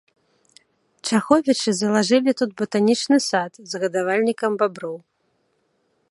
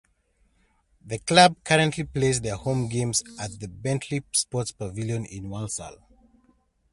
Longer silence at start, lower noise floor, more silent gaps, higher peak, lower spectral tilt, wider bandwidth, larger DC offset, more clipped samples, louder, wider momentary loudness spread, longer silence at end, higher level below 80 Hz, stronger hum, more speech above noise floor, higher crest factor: about the same, 1.05 s vs 1.05 s; about the same, -68 dBFS vs -67 dBFS; neither; about the same, -2 dBFS vs -2 dBFS; about the same, -4 dB/octave vs -4 dB/octave; about the same, 11.5 kHz vs 11.5 kHz; neither; neither; first, -20 LUFS vs -25 LUFS; second, 11 LU vs 17 LU; first, 1.15 s vs 1 s; second, -70 dBFS vs -52 dBFS; neither; first, 48 dB vs 42 dB; about the same, 20 dB vs 24 dB